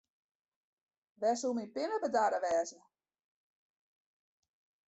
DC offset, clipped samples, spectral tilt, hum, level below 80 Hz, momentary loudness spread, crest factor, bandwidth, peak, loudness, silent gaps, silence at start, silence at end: under 0.1%; under 0.1%; -3 dB/octave; none; -82 dBFS; 6 LU; 20 dB; 8.2 kHz; -18 dBFS; -34 LUFS; none; 1.2 s; 2.15 s